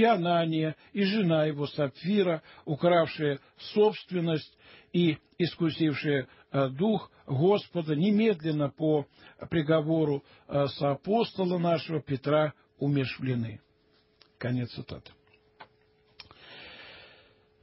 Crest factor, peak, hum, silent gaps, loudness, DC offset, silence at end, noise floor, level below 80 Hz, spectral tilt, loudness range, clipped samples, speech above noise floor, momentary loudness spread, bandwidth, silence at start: 18 dB; -12 dBFS; none; none; -29 LUFS; under 0.1%; 0.55 s; -66 dBFS; -66 dBFS; -11 dB/octave; 10 LU; under 0.1%; 39 dB; 12 LU; 5.8 kHz; 0 s